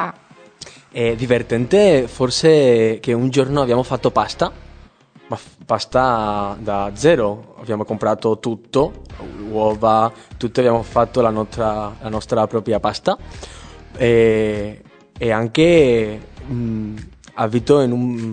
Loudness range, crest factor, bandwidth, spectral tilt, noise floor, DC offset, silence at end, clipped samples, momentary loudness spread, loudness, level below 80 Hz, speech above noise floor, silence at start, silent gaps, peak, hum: 5 LU; 16 dB; 9.4 kHz; -6 dB/octave; -46 dBFS; under 0.1%; 0 s; under 0.1%; 18 LU; -18 LUFS; -42 dBFS; 29 dB; 0 s; none; 0 dBFS; none